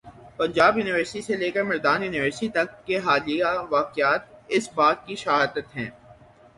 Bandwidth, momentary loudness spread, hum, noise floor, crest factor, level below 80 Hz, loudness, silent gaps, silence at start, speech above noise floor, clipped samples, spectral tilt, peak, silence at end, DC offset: 11.5 kHz; 9 LU; none; -51 dBFS; 20 dB; -60 dBFS; -23 LUFS; none; 0.05 s; 27 dB; under 0.1%; -4.5 dB/octave; -4 dBFS; 0.45 s; under 0.1%